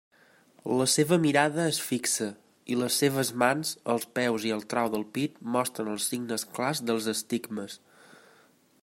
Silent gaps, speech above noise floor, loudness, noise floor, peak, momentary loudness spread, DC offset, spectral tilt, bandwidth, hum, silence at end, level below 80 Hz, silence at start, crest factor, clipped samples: none; 34 dB; -28 LUFS; -62 dBFS; -6 dBFS; 9 LU; under 0.1%; -3.5 dB/octave; 16.5 kHz; none; 1.05 s; -74 dBFS; 0.65 s; 22 dB; under 0.1%